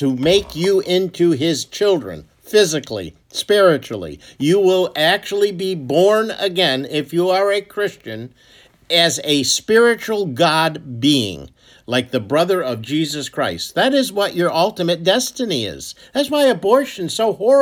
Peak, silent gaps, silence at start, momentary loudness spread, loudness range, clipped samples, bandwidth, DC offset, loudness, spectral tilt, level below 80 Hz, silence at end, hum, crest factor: 0 dBFS; none; 0 s; 11 LU; 2 LU; under 0.1%; 19.5 kHz; under 0.1%; -17 LUFS; -4 dB/octave; -54 dBFS; 0 s; none; 16 dB